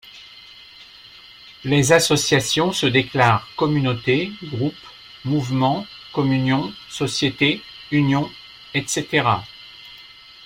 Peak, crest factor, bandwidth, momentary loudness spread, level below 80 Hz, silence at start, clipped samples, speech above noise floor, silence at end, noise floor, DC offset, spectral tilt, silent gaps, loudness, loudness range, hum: -2 dBFS; 20 dB; 16.5 kHz; 23 LU; -54 dBFS; 0.05 s; under 0.1%; 25 dB; 0 s; -44 dBFS; under 0.1%; -4.5 dB/octave; none; -20 LUFS; 4 LU; none